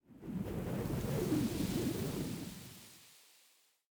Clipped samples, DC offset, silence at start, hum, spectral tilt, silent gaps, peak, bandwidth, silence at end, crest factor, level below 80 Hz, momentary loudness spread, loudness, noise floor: under 0.1%; under 0.1%; 0.1 s; none; -6 dB/octave; none; -24 dBFS; over 20 kHz; 0.7 s; 16 dB; -56 dBFS; 19 LU; -38 LUFS; -70 dBFS